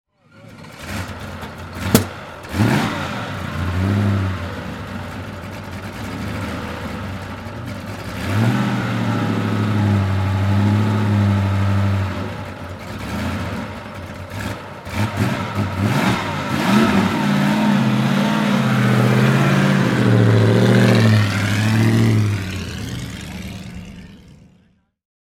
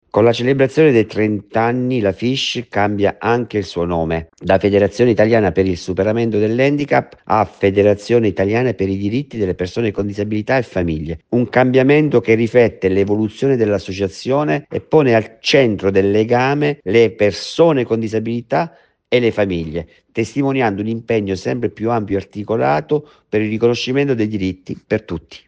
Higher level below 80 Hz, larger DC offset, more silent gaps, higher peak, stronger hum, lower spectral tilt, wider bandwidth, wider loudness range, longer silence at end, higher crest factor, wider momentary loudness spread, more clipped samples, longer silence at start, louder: first, -42 dBFS vs -48 dBFS; neither; neither; about the same, 0 dBFS vs 0 dBFS; neither; about the same, -6.5 dB/octave vs -6.5 dB/octave; first, 16.5 kHz vs 8.8 kHz; first, 11 LU vs 4 LU; first, 1 s vs 0.1 s; about the same, 18 dB vs 16 dB; first, 16 LU vs 9 LU; neither; first, 0.35 s vs 0.15 s; second, -19 LUFS vs -16 LUFS